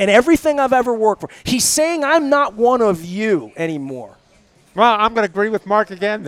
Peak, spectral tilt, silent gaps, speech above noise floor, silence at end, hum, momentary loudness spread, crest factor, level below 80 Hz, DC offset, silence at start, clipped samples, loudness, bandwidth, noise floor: 0 dBFS; -3.5 dB/octave; none; 37 dB; 0 s; none; 10 LU; 16 dB; -48 dBFS; under 0.1%; 0 s; under 0.1%; -16 LUFS; 17 kHz; -53 dBFS